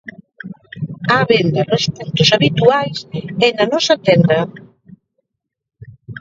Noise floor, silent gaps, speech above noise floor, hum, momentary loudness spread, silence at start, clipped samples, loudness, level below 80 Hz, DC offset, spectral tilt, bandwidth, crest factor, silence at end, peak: -78 dBFS; none; 64 dB; none; 21 LU; 0.05 s; under 0.1%; -14 LUFS; -52 dBFS; under 0.1%; -5 dB/octave; 7.8 kHz; 16 dB; 0 s; 0 dBFS